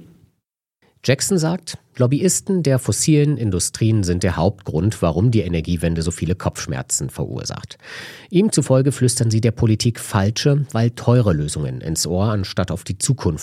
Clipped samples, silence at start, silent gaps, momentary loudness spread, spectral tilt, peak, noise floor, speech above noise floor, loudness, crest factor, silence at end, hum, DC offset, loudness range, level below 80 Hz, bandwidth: under 0.1%; 0 s; none; 10 LU; -5.5 dB/octave; 0 dBFS; -75 dBFS; 56 dB; -19 LUFS; 18 dB; 0 s; none; under 0.1%; 3 LU; -40 dBFS; 15.5 kHz